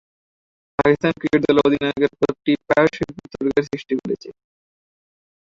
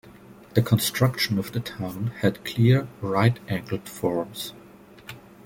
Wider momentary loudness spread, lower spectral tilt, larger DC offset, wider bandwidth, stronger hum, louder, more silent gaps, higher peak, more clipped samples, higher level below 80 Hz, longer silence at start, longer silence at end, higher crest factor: second, 12 LU vs 15 LU; about the same, -7 dB/octave vs -6 dB/octave; neither; second, 7.4 kHz vs 17 kHz; neither; first, -20 LUFS vs -25 LUFS; neither; about the same, -2 dBFS vs -4 dBFS; neither; about the same, -52 dBFS vs -56 dBFS; first, 0.8 s vs 0.05 s; first, 1.1 s vs 0.25 s; about the same, 18 dB vs 22 dB